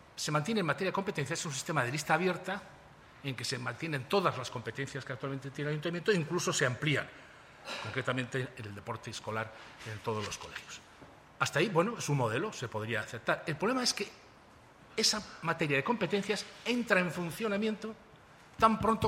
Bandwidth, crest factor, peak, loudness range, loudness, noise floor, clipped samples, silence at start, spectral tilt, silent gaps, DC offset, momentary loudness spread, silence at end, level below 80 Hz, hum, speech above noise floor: 16 kHz; 24 dB; -10 dBFS; 6 LU; -33 LUFS; -58 dBFS; under 0.1%; 0.15 s; -4 dB/octave; none; under 0.1%; 13 LU; 0 s; -64 dBFS; none; 24 dB